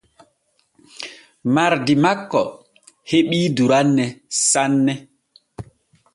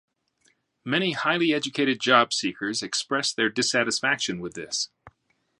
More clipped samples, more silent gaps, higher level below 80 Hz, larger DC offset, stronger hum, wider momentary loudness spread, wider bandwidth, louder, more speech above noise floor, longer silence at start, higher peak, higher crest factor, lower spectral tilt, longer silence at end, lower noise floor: neither; neither; first, -58 dBFS vs -68 dBFS; neither; neither; first, 18 LU vs 10 LU; about the same, 11.5 kHz vs 11.5 kHz; first, -18 LUFS vs -24 LUFS; about the same, 48 dB vs 45 dB; first, 1 s vs 0.85 s; about the same, -2 dBFS vs -4 dBFS; second, 18 dB vs 24 dB; first, -4 dB/octave vs -2.5 dB/octave; about the same, 0.5 s vs 0.5 s; second, -65 dBFS vs -70 dBFS